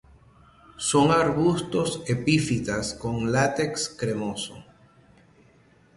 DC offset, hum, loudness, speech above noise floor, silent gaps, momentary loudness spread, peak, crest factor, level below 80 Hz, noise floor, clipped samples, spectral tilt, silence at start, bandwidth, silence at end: under 0.1%; none; -24 LUFS; 33 dB; none; 9 LU; -8 dBFS; 18 dB; -52 dBFS; -58 dBFS; under 0.1%; -5 dB/octave; 0.8 s; 11.5 kHz; 1.35 s